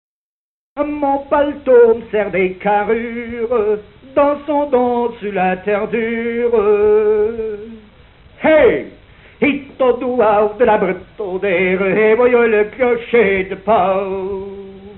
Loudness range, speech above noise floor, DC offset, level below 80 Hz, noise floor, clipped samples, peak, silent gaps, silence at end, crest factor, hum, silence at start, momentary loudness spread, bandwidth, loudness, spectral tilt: 3 LU; over 75 dB; under 0.1%; -46 dBFS; under -90 dBFS; under 0.1%; -2 dBFS; none; 0 s; 14 dB; none; 0.75 s; 12 LU; 4.2 kHz; -15 LUFS; -10.5 dB/octave